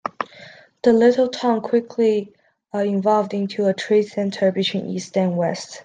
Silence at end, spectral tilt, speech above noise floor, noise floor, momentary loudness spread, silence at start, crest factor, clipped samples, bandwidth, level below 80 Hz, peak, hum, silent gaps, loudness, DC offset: 0 s; -6 dB/octave; 25 dB; -45 dBFS; 10 LU; 0.05 s; 16 dB; under 0.1%; 9.6 kHz; -66 dBFS; -4 dBFS; none; none; -20 LUFS; under 0.1%